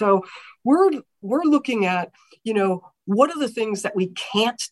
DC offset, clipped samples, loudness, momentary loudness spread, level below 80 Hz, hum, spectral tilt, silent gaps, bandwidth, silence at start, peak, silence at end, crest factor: under 0.1%; under 0.1%; -22 LUFS; 11 LU; -72 dBFS; none; -5 dB/octave; none; 12.5 kHz; 0 s; -4 dBFS; 0.05 s; 18 dB